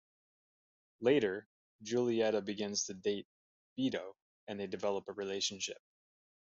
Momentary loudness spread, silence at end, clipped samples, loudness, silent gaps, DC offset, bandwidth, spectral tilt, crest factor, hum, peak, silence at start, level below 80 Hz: 16 LU; 0.7 s; under 0.1%; -36 LUFS; 1.46-1.79 s, 3.25-3.76 s, 4.22-4.47 s; under 0.1%; 8 kHz; -3.5 dB/octave; 20 dB; none; -18 dBFS; 1 s; -80 dBFS